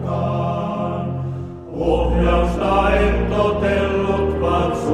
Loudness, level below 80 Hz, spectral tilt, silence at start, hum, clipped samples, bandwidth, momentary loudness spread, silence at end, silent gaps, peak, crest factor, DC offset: -19 LUFS; -26 dBFS; -7.5 dB/octave; 0 s; none; under 0.1%; 10.5 kHz; 8 LU; 0 s; none; -4 dBFS; 16 dB; under 0.1%